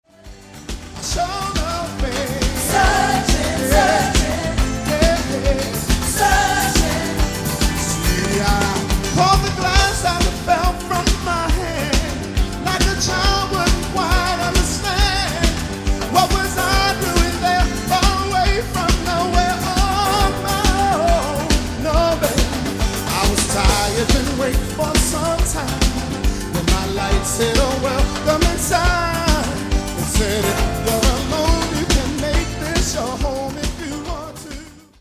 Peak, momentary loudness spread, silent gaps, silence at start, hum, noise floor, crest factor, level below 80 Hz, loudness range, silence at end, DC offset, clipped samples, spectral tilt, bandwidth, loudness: 0 dBFS; 6 LU; none; 0.25 s; none; -40 dBFS; 18 dB; -22 dBFS; 2 LU; 0.2 s; under 0.1%; under 0.1%; -4 dB/octave; 16 kHz; -18 LUFS